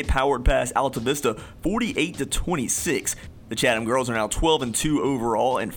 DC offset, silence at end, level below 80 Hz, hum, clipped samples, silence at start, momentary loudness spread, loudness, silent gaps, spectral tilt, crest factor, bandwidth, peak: under 0.1%; 0 s; -34 dBFS; none; under 0.1%; 0 s; 6 LU; -23 LUFS; none; -4 dB/octave; 16 dB; 19 kHz; -6 dBFS